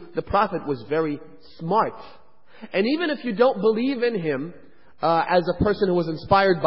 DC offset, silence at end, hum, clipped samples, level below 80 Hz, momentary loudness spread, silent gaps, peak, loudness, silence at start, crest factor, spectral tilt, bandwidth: 0.6%; 0 s; none; under 0.1%; -48 dBFS; 9 LU; none; -4 dBFS; -23 LUFS; 0 s; 20 dB; -11 dB/octave; 5.8 kHz